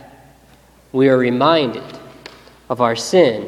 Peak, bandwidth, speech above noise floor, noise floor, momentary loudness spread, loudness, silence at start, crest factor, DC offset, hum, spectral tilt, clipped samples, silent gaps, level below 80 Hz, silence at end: 0 dBFS; 14 kHz; 34 dB; -49 dBFS; 21 LU; -16 LUFS; 0.95 s; 18 dB; under 0.1%; none; -5 dB/octave; under 0.1%; none; -56 dBFS; 0 s